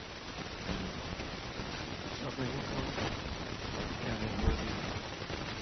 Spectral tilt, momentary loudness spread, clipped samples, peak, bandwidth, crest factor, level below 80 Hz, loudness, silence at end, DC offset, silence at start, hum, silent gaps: -4 dB/octave; 6 LU; under 0.1%; -18 dBFS; 6.2 kHz; 20 dB; -44 dBFS; -38 LUFS; 0 s; under 0.1%; 0 s; none; none